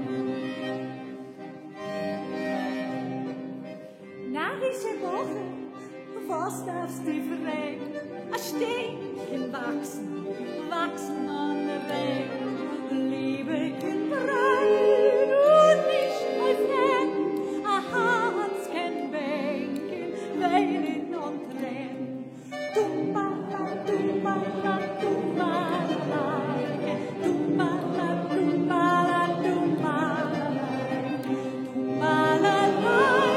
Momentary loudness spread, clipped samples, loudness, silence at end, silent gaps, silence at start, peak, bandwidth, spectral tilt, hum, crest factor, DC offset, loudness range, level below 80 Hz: 13 LU; under 0.1%; -27 LUFS; 0 s; none; 0 s; -8 dBFS; 16 kHz; -5.5 dB/octave; none; 18 dB; under 0.1%; 10 LU; -78 dBFS